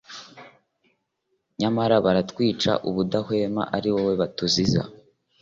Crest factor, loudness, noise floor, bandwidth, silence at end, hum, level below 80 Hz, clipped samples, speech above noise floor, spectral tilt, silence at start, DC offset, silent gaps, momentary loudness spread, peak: 18 dB; -23 LUFS; -75 dBFS; 7.8 kHz; 0.45 s; none; -54 dBFS; under 0.1%; 52 dB; -5.5 dB/octave; 0.1 s; under 0.1%; none; 10 LU; -6 dBFS